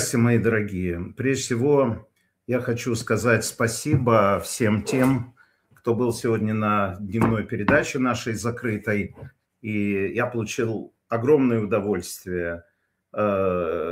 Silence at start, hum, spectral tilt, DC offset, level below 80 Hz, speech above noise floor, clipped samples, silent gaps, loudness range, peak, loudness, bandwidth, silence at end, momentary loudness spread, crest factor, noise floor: 0 s; none; -6 dB/octave; under 0.1%; -52 dBFS; 35 dB; under 0.1%; none; 3 LU; -6 dBFS; -23 LUFS; 16 kHz; 0 s; 9 LU; 18 dB; -58 dBFS